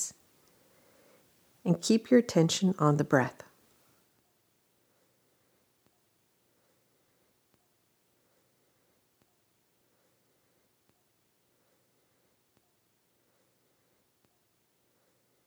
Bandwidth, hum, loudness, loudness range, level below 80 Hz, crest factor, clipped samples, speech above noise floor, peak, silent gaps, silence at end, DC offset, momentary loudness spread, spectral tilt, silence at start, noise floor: over 20 kHz; none; -27 LUFS; 7 LU; -80 dBFS; 26 dB; under 0.1%; 47 dB; -8 dBFS; none; 12.15 s; under 0.1%; 12 LU; -5.5 dB/octave; 0 s; -73 dBFS